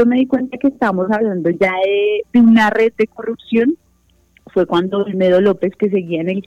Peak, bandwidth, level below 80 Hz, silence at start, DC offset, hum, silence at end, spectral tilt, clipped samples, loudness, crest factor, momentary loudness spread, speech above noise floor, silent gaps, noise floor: -2 dBFS; 7.8 kHz; -54 dBFS; 0 s; under 0.1%; none; 0.05 s; -7.5 dB/octave; under 0.1%; -15 LUFS; 14 dB; 8 LU; 41 dB; none; -56 dBFS